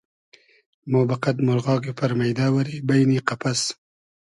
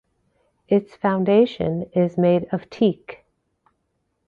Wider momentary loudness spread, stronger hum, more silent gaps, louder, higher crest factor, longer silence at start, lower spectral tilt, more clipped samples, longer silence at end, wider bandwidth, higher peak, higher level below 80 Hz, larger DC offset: second, 5 LU vs 9 LU; neither; neither; about the same, -22 LUFS vs -21 LUFS; about the same, 20 dB vs 18 dB; first, 0.85 s vs 0.7 s; second, -6 dB/octave vs -9 dB/octave; neither; second, 0.6 s vs 1.15 s; first, 11.5 kHz vs 6.8 kHz; about the same, -2 dBFS vs -4 dBFS; about the same, -62 dBFS vs -58 dBFS; neither